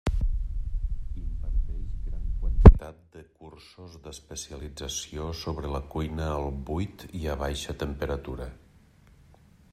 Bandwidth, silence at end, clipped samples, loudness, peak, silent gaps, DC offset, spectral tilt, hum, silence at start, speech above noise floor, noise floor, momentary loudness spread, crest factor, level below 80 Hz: 13 kHz; 1.2 s; under 0.1%; -28 LUFS; 0 dBFS; none; under 0.1%; -6.5 dB/octave; none; 0.05 s; 23 dB; -57 dBFS; 13 LU; 26 dB; -28 dBFS